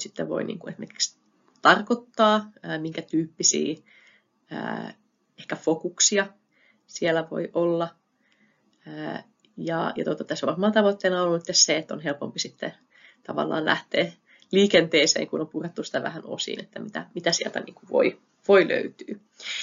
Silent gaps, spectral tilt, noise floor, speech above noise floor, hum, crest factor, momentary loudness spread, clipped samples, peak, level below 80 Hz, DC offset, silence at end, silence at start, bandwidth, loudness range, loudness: none; -2.5 dB/octave; -65 dBFS; 40 dB; none; 24 dB; 16 LU; under 0.1%; -2 dBFS; -72 dBFS; under 0.1%; 0 s; 0 s; 7.6 kHz; 5 LU; -24 LUFS